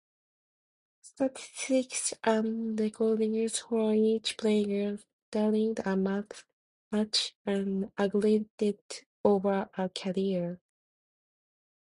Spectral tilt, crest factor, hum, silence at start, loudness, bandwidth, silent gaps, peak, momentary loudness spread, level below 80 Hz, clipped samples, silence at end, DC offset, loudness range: -4.5 dB/octave; 20 dB; none; 1.05 s; -30 LUFS; 11.5 kHz; 5.13-5.32 s, 6.53-6.91 s, 7.35-7.45 s, 8.50-8.58 s, 8.81-8.89 s, 9.06-9.24 s; -12 dBFS; 9 LU; -72 dBFS; under 0.1%; 1.3 s; under 0.1%; 2 LU